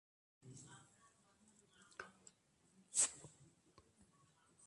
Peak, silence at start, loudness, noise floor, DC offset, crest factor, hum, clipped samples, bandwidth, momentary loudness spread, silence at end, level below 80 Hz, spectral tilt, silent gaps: -22 dBFS; 0.45 s; -38 LUFS; -75 dBFS; under 0.1%; 28 dB; none; under 0.1%; 11.5 kHz; 25 LU; 1.25 s; -86 dBFS; 0 dB/octave; none